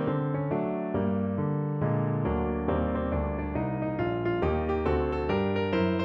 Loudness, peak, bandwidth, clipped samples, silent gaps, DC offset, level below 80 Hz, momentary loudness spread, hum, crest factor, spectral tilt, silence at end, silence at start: -29 LUFS; -12 dBFS; 5.8 kHz; under 0.1%; none; under 0.1%; -40 dBFS; 3 LU; none; 14 dB; -10 dB/octave; 0 s; 0 s